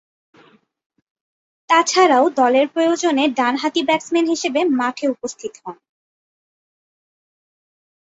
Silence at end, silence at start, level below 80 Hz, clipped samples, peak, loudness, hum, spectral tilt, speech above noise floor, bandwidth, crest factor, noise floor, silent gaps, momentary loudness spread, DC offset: 2.4 s; 1.7 s; -70 dBFS; under 0.1%; -2 dBFS; -17 LUFS; none; -2 dB/octave; 36 dB; 8 kHz; 18 dB; -53 dBFS; none; 15 LU; under 0.1%